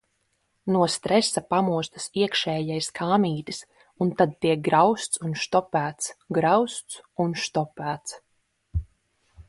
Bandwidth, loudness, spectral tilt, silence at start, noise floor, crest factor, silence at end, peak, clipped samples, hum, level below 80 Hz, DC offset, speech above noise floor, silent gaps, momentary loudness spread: 12 kHz; -25 LUFS; -4.5 dB/octave; 0.65 s; -72 dBFS; 20 dB; 0.05 s; -6 dBFS; under 0.1%; none; -46 dBFS; under 0.1%; 48 dB; none; 12 LU